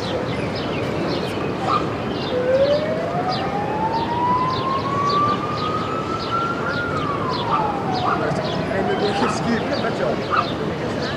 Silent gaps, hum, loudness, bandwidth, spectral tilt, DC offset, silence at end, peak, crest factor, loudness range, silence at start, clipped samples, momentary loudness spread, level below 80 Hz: none; none; -21 LUFS; 14 kHz; -6 dB/octave; under 0.1%; 0 s; -6 dBFS; 14 dB; 1 LU; 0 s; under 0.1%; 5 LU; -46 dBFS